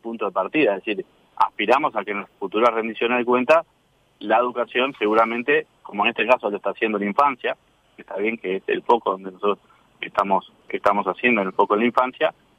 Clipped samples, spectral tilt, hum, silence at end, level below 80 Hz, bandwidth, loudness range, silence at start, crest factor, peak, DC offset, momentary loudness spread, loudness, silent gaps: under 0.1%; -6 dB/octave; none; 0.25 s; -66 dBFS; 11 kHz; 3 LU; 0.05 s; 18 dB; -4 dBFS; under 0.1%; 9 LU; -21 LUFS; none